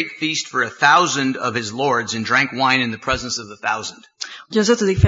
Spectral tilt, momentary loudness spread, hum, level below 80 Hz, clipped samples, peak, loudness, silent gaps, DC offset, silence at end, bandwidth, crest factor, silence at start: -4 dB/octave; 11 LU; none; -44 dBFS; under 0.1%; 0 dBFS; -18 LUFS; none; under 0.1%; 0 s; 8 kHz; 18 dB; 0 s